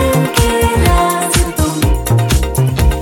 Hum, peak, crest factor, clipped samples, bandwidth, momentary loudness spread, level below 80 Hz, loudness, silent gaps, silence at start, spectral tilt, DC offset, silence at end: none; 0 dBFS; 12 dB; under 0.1%; 17 kHz; 3 LU; -18 dBFS; -13 LUFS; none; 0 s; -5 dB/octave; under 0.1%; 0 s